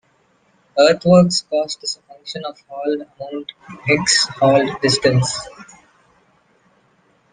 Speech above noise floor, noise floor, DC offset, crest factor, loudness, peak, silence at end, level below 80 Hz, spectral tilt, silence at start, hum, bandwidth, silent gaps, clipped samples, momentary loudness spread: 42 dB; -59 dBFS; under 0.1%; 18 dB; -17 LUFS; 0 dBFS; 1.7 s; -54 dBFS; -4 dB/octave; 0.75 s; none; 10 kHz; none; under 0.1%; 18 LU